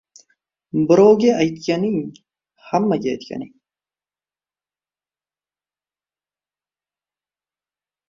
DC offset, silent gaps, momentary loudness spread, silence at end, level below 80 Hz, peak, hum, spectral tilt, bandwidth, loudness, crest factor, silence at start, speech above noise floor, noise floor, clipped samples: under 0.1%; none; 20 LU; 4.6 s; -62 dBFS; -2 dBFS; 50 Hz at -50 dBFS; -6.5 dB/octave; 7.4 kHz; -18 LUFS; 20 dB; 0.75 s; over 73 dB; under -90 dBFS; under 0.1%